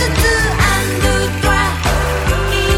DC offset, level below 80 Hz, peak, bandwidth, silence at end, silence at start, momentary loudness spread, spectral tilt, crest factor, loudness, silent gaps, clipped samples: under 0.1%; -20 dBFS; 0 dBFS; 17 kHz; 0 s; 0 s; 3 LU; -4 dB/octave; 14 dB; -14 LUFS; none; under 0.1%